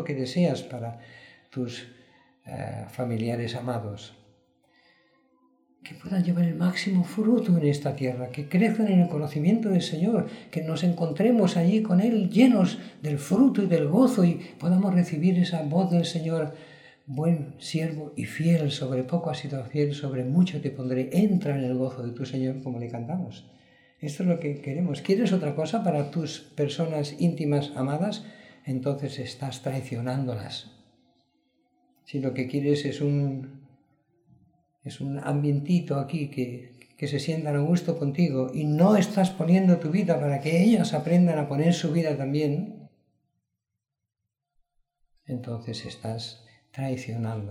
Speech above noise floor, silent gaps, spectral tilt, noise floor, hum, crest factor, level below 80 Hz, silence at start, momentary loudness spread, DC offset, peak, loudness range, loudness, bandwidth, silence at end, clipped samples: 59 dB; none; -7.5 dB/octave; -85 dBFS; none; 20 dB; -70 dBFS; 0 s; 14 LU; under 0.1%; -6 dBFS; 12 LU; -26 LUFS; 12.5 kHz; 0 s; under 0.1%